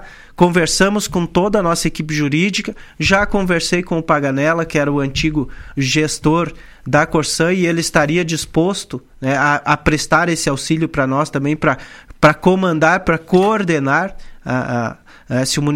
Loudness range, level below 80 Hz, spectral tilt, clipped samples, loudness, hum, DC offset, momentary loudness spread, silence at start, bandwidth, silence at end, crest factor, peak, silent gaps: 2 LU; -36 dBFS; -5 dB/octave; under 0.1%; -16 LUFS; none; under 0.1%; 8 LU; 0 s; 16.5 kHz; 0 s; 16 dB; 0 dBFS; none